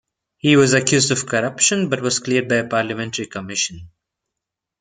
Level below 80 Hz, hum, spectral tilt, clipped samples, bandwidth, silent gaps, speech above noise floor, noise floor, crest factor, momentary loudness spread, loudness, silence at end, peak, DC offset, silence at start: -58 dBFS; none; -3.5 dB/octave; under 0.1%; 9.6 kHz; none; 65 dB; -83 dBFS; 18 dB; 10 LU; -18 LUFS; 0.95 s; -2 dBFS; under 0.1%; 0.45 s